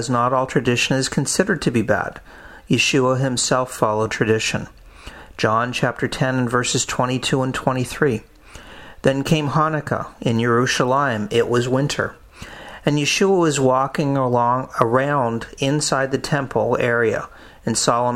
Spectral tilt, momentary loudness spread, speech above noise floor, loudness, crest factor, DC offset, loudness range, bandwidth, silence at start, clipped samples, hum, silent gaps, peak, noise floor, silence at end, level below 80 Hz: -4.5 dB/octave; 9 LU; 21 dB; -19 LUFS; 20 dB; under 0.1%; 2 LU; 16 kHz; 0 s; under 0.1%; none; none; 0 dBFS; -40 dBFS; 0 s; -46 dBFS